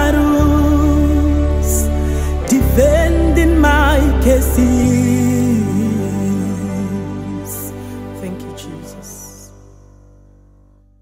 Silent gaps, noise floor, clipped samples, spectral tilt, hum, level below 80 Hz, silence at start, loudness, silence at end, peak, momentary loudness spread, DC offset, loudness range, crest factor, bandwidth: none; -48 dBFS; under 0.1%; -6.5 dB/octave; 50 Hz at -40 dBFS; -20 dBFS; 0 s; -14 LUFS; 1.55 s; -2 dBFS; 17 LU; under 0.1%; 16 LU; 14 dB; 16.5 kHz